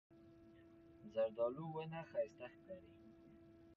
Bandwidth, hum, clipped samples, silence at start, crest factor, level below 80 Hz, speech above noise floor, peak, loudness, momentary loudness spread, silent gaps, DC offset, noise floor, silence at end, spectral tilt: 6.8 kHz; none; under 0.1%; 0.1 s; 18 dB; -78 dBFS; 20 dB; -30 dBFS; -45 LUFS; 23 LU; none; under 0.1%; -64 dBFS; 0 s; -6 dB/octave